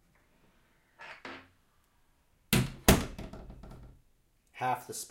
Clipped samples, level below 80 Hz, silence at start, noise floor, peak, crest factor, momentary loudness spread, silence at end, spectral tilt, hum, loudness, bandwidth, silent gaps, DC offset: under 0.1%; -44 dBFS; 1 s; -69 dBFS; -4 dBFS; 30 dB; 25 LU; 0.05 s; -4 dB/octave; none; -30 LUFS; 16.5 kHz; none; under 0.1%